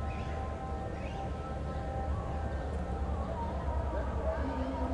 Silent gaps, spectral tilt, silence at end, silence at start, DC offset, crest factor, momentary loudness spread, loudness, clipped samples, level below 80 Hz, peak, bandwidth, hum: none; -8 dB/octave; 0 s; 0 s; under 0.1%; 14 dB; 4 LU; -37 LUFS; under 0.1%; -38 dBFS; -22 dBFS; 9.6 kHz; none